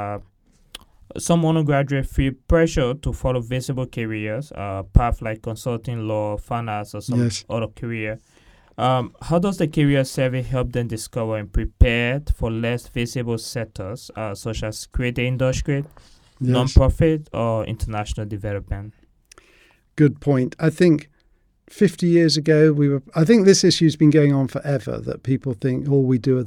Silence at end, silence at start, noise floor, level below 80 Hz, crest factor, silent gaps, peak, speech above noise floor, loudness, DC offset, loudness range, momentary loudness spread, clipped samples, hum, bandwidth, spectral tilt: 0 s; 0 s; -60 dBFS; -30 dBFS; 20 dB; none; 0 dBFS; 40 dB; -21 LUFS; under 0.1%; 8 LU; 13 LU; under 0.1%; none; 15.5 kHz; -6 dB/octave